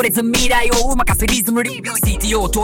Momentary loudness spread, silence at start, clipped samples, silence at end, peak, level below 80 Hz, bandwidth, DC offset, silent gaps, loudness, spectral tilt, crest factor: 4 LU; 0 s; under 0.1%; 0 s; -2 dBFS; -22 dBFS; 17 kHz; under 0.1%; none; -16 LUFS; -3.5 dB/octave; 12 dB